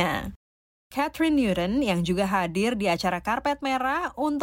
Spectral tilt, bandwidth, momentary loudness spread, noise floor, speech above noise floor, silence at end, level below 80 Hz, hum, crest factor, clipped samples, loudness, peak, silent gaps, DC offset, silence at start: -5.5 dB/octave; 16.5 kHz; 6 LU; under -90 dBFS; over 65 dB; 0 s; -48 dBFS; none; 16 dB; under 0.1%; -25 LUFS; -10 dBFS; 0.36-0.90 s; under 0.1%; 0 s